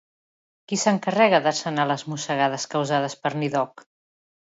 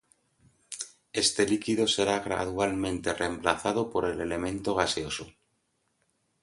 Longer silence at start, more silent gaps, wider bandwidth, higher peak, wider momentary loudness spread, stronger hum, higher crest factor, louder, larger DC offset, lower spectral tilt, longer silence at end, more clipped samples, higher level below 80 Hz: about the same, 0.7 s vs 0.7 s; neither; second, 8 kHz vs 11.5 kHz; about the same, -4 dBFS vs -6 dBFS; second, 9 LU vs 12 LU; neither; about the same, 20 dB vs 24 dB; first, -23 LUFS vs -28 LUFS; neither; about the same, -4 dB/octave vs -3.5 dB/octave; second, 0.9 s vs 1.15 s; neither; second, -74 dBFS vs -54 dBFS